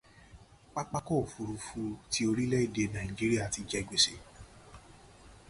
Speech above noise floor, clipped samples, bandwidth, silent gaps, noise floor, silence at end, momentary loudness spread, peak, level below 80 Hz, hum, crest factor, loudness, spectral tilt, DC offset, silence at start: 24 dB; under 0.1%; 11.5 kHz; none; -56 dBFS; 0.1 s; 13 LU; -12 dBFS; -54 dBFS; none; 22 dB; -32 LUFS; -4 dB/octave; under 0.1%; 0.15 s